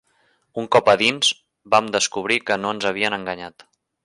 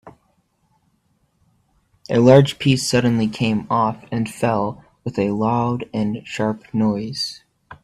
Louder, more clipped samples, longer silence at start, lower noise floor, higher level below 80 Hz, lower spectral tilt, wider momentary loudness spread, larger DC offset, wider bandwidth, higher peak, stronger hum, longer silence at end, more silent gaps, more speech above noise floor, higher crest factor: about the same, -19 LUFS vs -19 LUFS; neither; first, 0.55 s vs 0.05 s; about the same, -64 dBFS vs -65 dBFS; second, -62 dBFS vs -54 dBFS; second, -2.5 dB/octave vs -6 dB/octave; first, 16 LU vs 12 LU; neither; second, 11.5 kHz vs 14 kHz; about the same, -2 dBFS vs 0 dBFS; neither; first, 0.55 s vs 0.1 s; neither; about the same, 44 dB vs 46 dB; about the same, 18 dB vs 20 dB